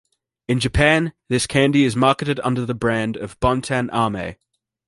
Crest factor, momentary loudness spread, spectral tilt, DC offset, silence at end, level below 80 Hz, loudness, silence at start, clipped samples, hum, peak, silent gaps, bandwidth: 18 dB; 8 LU; -5.5 dB/octave; under 0.1%; 0.55 s; -36 dBFS; -19 LUFS; 0.5 s; under 0.1%; none; -2 dBFS; none; 11.5 kHz